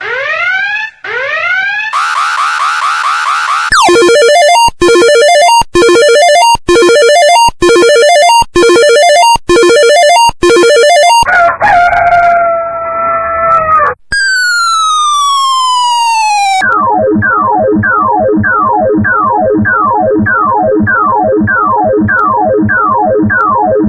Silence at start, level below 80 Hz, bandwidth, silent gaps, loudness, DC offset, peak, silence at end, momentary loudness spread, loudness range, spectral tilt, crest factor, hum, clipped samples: 0 s; -34 dBFS; 11 kHz; none; -7 LUFS; under 0.1%; 0 dBFS; 0 s; 6 LU; 4 LU; -3 dB/octave; 8 dB; none; 0.2%